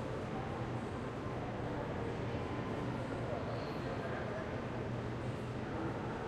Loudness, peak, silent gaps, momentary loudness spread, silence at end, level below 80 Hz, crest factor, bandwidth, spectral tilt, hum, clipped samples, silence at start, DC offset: -41 LUFS; -26 dBFS; none; 1 LU; 0 s; -56 dBFS; 12 dB; 11 kHz; -7.5 dB/octave; none; under 0.1%; 0 s; under 0.1%